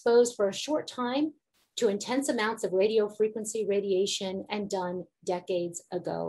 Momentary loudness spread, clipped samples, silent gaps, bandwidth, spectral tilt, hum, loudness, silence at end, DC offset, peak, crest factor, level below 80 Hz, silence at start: 9 LU; under 0.1%; none; 12.5 kHz; -4 dB/octave; none; -29 LUFS; 0 s; under 0.1%; -12 dBFS; 18 dB; -76 dBFS; 0.05 s